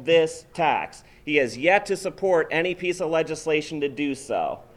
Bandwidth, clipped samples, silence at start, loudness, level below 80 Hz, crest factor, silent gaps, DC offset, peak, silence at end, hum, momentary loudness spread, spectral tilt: 13 kHz; under 0.1%; 0 s; -24 LUFS; -58 dBFS; 20 dB; none; under 0.1%; -4 dBFS; 0.15 s; none; 8 LU; -4.5 dB/octave